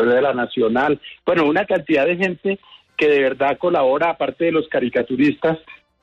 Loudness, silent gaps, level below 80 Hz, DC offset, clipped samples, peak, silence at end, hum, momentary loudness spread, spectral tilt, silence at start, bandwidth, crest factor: -19 LUFS; none; -56 dBFS; under 0.1%; under 0.1%; -8 dBFS; 0.25 s; none; 6 LU; -7 dB/octave; 0 s; 7.8 kHz; 12 dB